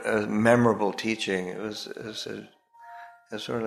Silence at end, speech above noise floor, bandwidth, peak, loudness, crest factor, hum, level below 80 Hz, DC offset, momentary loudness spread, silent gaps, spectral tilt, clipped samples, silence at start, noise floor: 0 s; 20 dB; 14 kHz; -4 dBFS; -27 LUFS; 22 dB; none; -64 dBFS; under 0.1%; 24 LU; none; -5.5 dB/octave; under 0.1%; 0 s; -47 dBFS